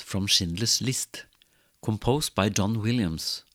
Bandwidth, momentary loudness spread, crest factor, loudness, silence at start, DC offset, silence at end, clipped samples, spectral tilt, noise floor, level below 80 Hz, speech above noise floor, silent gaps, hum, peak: 17 kHz; 10 LU; 20 dB; -26 LUFS; 0 s; under 0.1%; 0.15 s; under 0.1%; -3.5 dB/octave; -64 dBFS; -50 dBFS; 37 dB; none; none; -6 dBFS